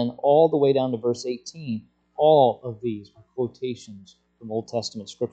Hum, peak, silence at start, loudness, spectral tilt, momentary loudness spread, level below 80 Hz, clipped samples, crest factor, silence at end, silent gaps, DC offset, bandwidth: none; -6 dBFS; 0 s; -23 LUFS; -6.5 dB/octave; 16 LU; -68 dBFS; under 0.1%; 18 dB; 0.05 s; none; under 0.1%; 8.6 kHz